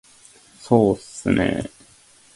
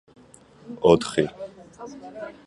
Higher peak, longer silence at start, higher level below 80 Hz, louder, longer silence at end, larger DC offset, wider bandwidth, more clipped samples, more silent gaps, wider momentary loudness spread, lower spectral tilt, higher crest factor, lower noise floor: about the same, -2 dBFS vs -2 dBFS; about the same, 0.6 s vs 0.7 s; first, -46 dBFS vs -54 dBFS; about the same, -21 LUFS vs -22 LUFS; first, 0.7 s vs 0.15 s; neither; about the same, 11.5 kHz vs 11.5 kHz; neither; neither; second, 11 LU vs 23 LU; about the same, -6.5 dB/octave vs -5.5 dB/octave; about the same, 22 dB vs 24 dB; about the same, -52 dBFS vs -51 dBFS